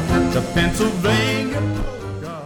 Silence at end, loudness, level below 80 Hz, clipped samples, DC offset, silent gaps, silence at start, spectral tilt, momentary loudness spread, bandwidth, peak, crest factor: 0 s; -20 LUFS; -32 dBFS; under 0.1%; under 0.1%; none; 0 s; -5.5 dB/octave; 11 LU; 18 kHz; -8 dBFS; 12 dB